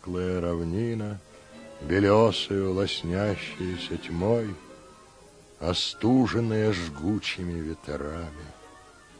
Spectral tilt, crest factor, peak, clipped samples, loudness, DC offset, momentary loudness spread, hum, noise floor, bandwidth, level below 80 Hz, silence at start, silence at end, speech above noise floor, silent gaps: -6 dB/octave; 20 dB; -8 dBFS; under 0.1%; -27 LUFS; under 0.1%; 17 LU; none; -52 dBFS; 10.5 kHz; -50 dBFS; 0 s; 0.35 s; 26 dB; none